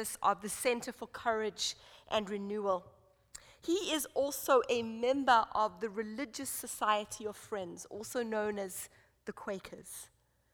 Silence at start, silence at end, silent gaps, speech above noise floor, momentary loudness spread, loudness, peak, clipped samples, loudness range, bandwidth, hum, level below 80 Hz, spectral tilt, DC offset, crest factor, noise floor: 0 s; 0.5 s; none; 22 dB; 18 LU; -35 LUFS; -14 dBFS; under 0.1%; 6 LU; over 20 kHz; none; -68 dBFS; -2.5 dB/octave; under 0.1%; 22 dB; -57 dBFS